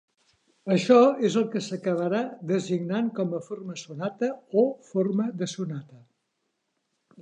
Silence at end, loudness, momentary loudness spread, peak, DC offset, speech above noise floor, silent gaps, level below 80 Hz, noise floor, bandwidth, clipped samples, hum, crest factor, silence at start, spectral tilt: 0 s; -26 LUFS; 15 LU; -6 dBFS; under 0.1%; 52 dB; none; -80 dBFS; -78 dBFS; 9.6 kHz; under 0.1%; none; 20 dB; 0.65 s; -6.5 dB/octave